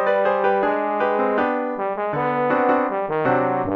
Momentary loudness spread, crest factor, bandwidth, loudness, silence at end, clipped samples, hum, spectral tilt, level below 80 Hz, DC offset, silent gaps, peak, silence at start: 5 LU; 14 dB; 5.8 kHz; -20 LUFS; 0 s; under 0.1%; none; -8.5 dB/octave; -58 dBFS; under 0.1%; none; -6 dBFS; 0 s